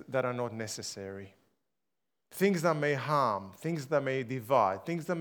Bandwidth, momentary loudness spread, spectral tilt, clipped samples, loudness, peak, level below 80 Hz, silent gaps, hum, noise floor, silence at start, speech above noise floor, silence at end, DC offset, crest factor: over 20 kHz; 12 LU; -5.5 dB/octave; under 0.1%; -31 LUFS; -12 dBFS; -82 dBFS; none; none; -88 dBFS; 0 s; 57 dB; 0 s; under 0.1%; 20 dB